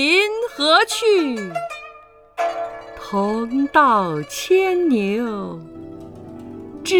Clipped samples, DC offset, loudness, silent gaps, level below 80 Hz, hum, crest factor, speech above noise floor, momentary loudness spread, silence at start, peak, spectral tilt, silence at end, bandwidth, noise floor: under 0.1%; under 0.1%; -19 LUFS; none; -56 dBFS; 50 Hz at -45 dBFS; 18 dB; 27 dB; 22 LU; 0 s; -2 dBFS; -4 dB/octave; 0 s; 19 kHz; -45 dBFS